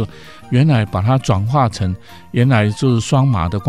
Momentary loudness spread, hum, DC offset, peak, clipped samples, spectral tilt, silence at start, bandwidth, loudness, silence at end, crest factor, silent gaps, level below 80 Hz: 9 LU; none; 0.7%; 0 dBFS; under 0.1%; -7 dB/octave; 0 s; 11.5 kHz; -16 LUFS; 0 s; 14 dB; none; -40 dBFS